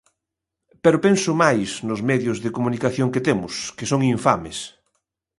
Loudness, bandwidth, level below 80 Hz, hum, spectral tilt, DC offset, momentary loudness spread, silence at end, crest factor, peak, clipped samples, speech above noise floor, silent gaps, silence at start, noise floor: -21 LUFS; 11.5 kHz; -54 dBFS; none; -5.5 dB/octave; under 0.1%; 10 LU; 0.7 s; 20 dB; -2 dBFS; under 0.1%; 63 dB; none; 0.85 s; -83 dBFS